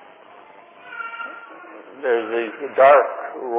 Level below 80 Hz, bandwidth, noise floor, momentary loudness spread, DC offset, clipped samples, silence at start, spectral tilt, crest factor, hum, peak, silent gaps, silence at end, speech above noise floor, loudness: -82 dBFS; 4 kHz; -46 dBFS; 26 LU; under 0.1%; under 0.1%; 0.85 s; -7 dB/octave; 20 dB; none; -2 dBFS; none; 0 s; 28 dB; -19 LUFS